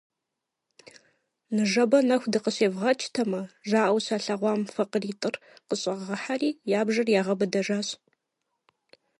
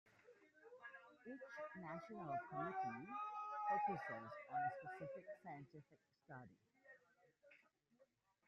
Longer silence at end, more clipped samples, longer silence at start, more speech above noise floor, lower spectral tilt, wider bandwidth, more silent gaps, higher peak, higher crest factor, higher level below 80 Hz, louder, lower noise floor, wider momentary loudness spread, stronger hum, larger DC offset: first, 1.25 s vs 0.45 s; neither; first, 1.5 s vs 0.05 s; first, 59 dB vs 30 dB; second, -4.5 dB/octave vs -7 dB/octave; first, 11.5 kHz vs 8 kHz; neither; first, -8 dBFS vs -32 dBFS; about the same, 18 dB vs 20 dB; first, -78 dBFS vs -88 dBFS; first, -26 LUFS vs -49 LUFS; first, -85 dBFS vs -79 dBFS; second, 10 LU vs 23 LU; neither; neither